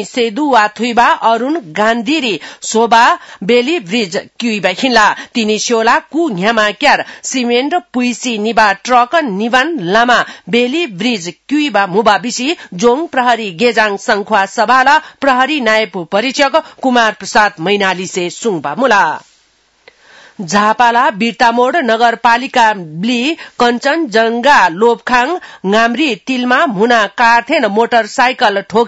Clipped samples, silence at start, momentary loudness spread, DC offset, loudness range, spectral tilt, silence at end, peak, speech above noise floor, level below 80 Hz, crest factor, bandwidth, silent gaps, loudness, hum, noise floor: 0.3%; 0 s; 7 LU; under 0.1%; 2 LU; -3.5 dB/octave; 0 s; 0 dBFS; 42 dB; -52 dBFS; 12 dB; 12 kHz; none; -12 LUFS; none; -54 dBFS